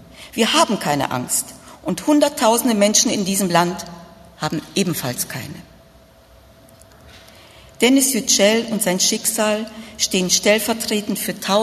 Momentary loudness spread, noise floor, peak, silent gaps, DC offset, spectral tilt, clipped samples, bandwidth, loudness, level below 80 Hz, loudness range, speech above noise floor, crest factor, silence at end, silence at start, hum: 12 LU; -48 dBFS; 0 dBFS; none; under 0.1%; -3 dB/octave; under 0.1%; 14 kHz; -18 LUFS; -54 dBFS; 10 LU; 30 dB; 20 dB; 0 s; 0.15 s; none